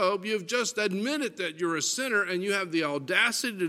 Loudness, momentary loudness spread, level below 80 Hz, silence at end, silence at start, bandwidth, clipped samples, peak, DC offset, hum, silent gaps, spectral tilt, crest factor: -27 LUFS; 6 LU; -82 dBFS; 0 s; 0 s; 16 kHz; under 0.1%; -8 dBFS; under 0.1%; none; none; -2.5 dB/octave; 20 dB